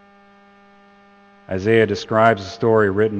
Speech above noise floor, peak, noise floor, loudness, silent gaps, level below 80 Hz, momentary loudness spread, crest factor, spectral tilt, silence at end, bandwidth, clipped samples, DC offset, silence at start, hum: 33 dB; 0 dBFS; -50 dBFS; -18 LUFS; none; -60 dBFS; 7 LU; 20 dB; -6.5 dB/octave; 0 s; 8.4 kHz; under 0.1%; under 0.1%; 1.5 s; none